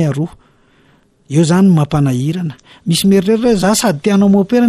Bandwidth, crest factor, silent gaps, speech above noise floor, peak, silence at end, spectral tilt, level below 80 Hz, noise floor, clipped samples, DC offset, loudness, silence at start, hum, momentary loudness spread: 14 kHz; 10 dB; none; 39 dB; -2 dBFS; 0 s; -6 dB/octave; -42 dBFS; -51 dBFS; under 0.1%; under 0.1%; -13 LUFS; 0 s; none; 11 LU